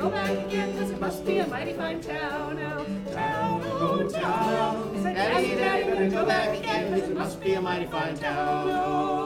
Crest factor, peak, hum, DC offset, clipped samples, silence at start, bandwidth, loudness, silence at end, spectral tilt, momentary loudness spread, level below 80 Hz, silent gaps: 16 dB; -10 dBFS; none; under 0.1%; under 0.1%; 0 s; 17 kHz; -27 LUFS; 0 s; -5.5 dB/octave; 7 LU; -52 dBFS; none